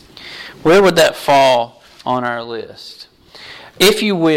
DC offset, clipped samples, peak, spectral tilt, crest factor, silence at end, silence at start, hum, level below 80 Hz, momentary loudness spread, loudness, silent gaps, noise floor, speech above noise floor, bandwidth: under 0.1%; under 0.1%; -2 dBFS; -4 dB/octave; 14 dB; 0 s; 0.2 s; none; -48 dBFS; 23 LU; -13 LUFS; none; -38 dBFS; 24 dB; 16.5 kHz